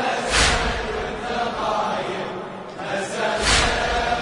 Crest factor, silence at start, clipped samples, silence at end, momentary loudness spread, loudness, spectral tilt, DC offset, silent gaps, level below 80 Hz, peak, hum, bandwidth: 20 dB; 0 s; under 0.1%; 0 s; 12 LU; -21 LUFS; -2.5 dB/octave; under 0.1%; none; -34 dBFS; -4 dBFS; none; 11 kHz